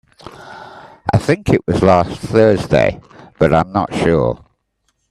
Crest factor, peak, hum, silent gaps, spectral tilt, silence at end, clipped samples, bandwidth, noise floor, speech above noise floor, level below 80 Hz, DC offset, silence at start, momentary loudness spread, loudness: 16 dB; 0 dBFS; none; none; -7 dB/octave; 0.75 s; under 0.1%; 13 kHz; -67 dBFS; 53 dB; -38 dBFS; under 0.1%; 0.25 s; 22 LU; -15 LUFS